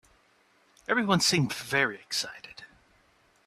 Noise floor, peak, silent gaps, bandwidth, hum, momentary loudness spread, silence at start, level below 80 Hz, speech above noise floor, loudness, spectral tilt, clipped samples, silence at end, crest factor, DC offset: -65 dBFS; -10 dBFS; none; 15 kHz; none; 21 LU; 0.9 s; -66 dBFS; 37 dB; -27 LUFS; -3.5 dB/octave; under 0.1%; 0.8 s; 22 dB; under 0.1%